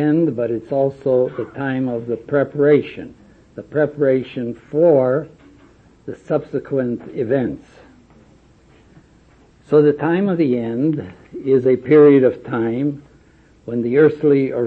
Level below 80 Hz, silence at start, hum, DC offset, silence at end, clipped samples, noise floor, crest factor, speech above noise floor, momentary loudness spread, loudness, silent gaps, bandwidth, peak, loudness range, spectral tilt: -56 dBFS; 0 s; none; under 0.1%; 0 s; under 0.1%; -50 dBFS; 16 dB; 34 dB; 19 LU; -18 LUFS; none; 4.5 kHz; -2 dBFS; 9 LU; -10 dB/octave